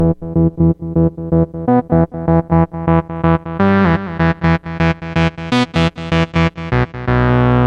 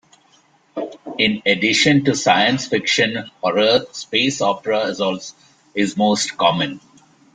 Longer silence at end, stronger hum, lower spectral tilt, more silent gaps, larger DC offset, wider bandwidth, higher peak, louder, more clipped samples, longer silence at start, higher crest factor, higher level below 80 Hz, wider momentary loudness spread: second, 0 s vs 0.55 s; neither; first, -8 dB/octave vs -3.5 dB/octave; neither; neither; second, 7.8 kHz vs 9.6 kHz; about the same, 0 dBFS vs -2 dBFS; about the same, -15 LUFS vs -17 LUFS; neither; second, 0 s vs 0.75 s; about the same, 14 dB vs 18 dB; first, -30 dBFS vs -60 dBFS; second, 4 LU vs 15 LU